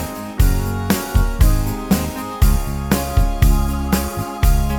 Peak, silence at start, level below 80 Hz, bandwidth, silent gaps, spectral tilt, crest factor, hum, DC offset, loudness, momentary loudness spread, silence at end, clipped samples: 0 dBFS; 0 s; -18 dBFS; over 20 kHz; none; -5.5 dB/octave; 16 dB; none; under 0.1%; -19 LUFS; 5 LU; 0 s; under 0.1%